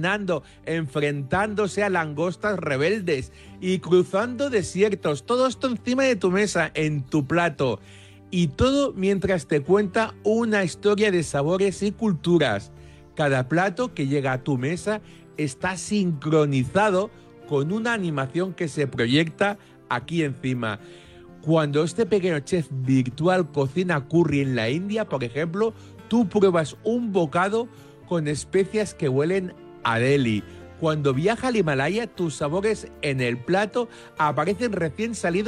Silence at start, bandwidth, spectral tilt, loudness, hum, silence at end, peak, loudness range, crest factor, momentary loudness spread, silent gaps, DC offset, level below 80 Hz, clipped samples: 0 s; 12 kHz; -6 dB/octave; -24 LUFS; none; 0 s; -6 dBFS; 2 LU; 16 dB; 7 LU; none; under 0.1%; -52 dBFS; under 0.1%